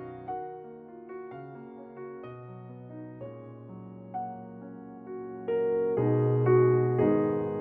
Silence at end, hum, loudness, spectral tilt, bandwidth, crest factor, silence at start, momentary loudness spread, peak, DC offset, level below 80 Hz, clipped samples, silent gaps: 0 s; none; -27 LUFS; -12 dB/octave; 3.3 kHz; 18 dB; 0 s; 21 LU; -12 dBFS; under 0.1%; -66 dBFS; under 0.1%; none